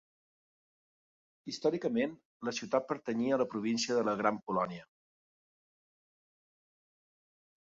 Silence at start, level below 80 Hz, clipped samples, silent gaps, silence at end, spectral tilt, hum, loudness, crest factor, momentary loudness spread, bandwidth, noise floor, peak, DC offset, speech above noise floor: 1.45 s; -78 dBFS; under 0.1%; 2.25-2.40 s; 2.9 s; -4 dB/octave; none; -34 LUFS; 22 dB; 9 LU; 7.6 kHz; under -90 dBFS; -14 dBFS; under 0.1%; over 57 dB